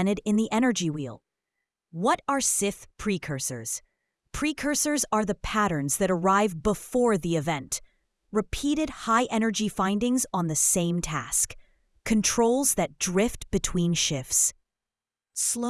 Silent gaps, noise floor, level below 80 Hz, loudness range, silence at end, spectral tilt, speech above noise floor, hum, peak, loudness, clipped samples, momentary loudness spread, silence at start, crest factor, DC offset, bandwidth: none; under -90 dBFS; -48 dBFS; 3 LU; 0 s; -3.5 dB/octave; over 64 dB; none; -6 dBFS; -26 LUFS; under 0.1%; 8 LU; 0 s; 20 dB; under 0.1%; 12 kHz